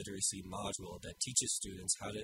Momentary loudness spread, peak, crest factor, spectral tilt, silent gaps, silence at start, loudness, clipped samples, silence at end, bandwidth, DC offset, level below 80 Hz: 9 LU; -16 dBFS; 24 dB; -2 dB/octave; none; 0 s; -37 LUFS; under 0.1%; 0 s; 16 kHz; under 0.1%; -62 dBFS